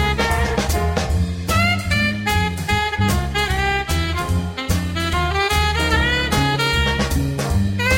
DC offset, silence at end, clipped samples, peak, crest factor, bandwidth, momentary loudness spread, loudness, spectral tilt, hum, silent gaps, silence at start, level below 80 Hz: under 0.1%; 0 s; under 0.1%; -4 dBFS; 16 dB; 16.5 kHz; 4 LU; -19 LUFS; -4.5 dB/octave; none; none; 0 s; -26 dBFS